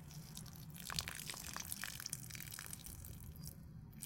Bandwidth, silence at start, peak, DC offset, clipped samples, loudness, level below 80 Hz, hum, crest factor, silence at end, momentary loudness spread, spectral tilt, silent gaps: 17 kHz; 0 s; -16 dBFS; under 0.1%; under 0.1%; -47 LUFS; -62 dBFS; none; 34 dB; 0 s; 10 LU; -2 dB/octave; none